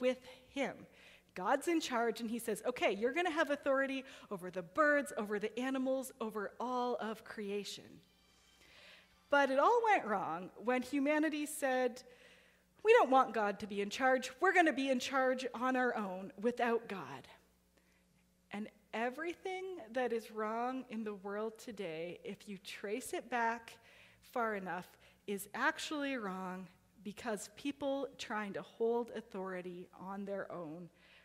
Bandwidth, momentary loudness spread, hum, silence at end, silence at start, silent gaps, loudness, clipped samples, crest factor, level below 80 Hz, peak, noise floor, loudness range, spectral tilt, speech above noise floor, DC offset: 16 kHz; 15 LU; none; 0.35 s; 0 s; none; -37 LUFS; under 0.1%; 22 dB; -78 dBFS; -16 dBFS; -72 dBFS; 9 LU; -4 dB/octave; 36 dB; under 0.1%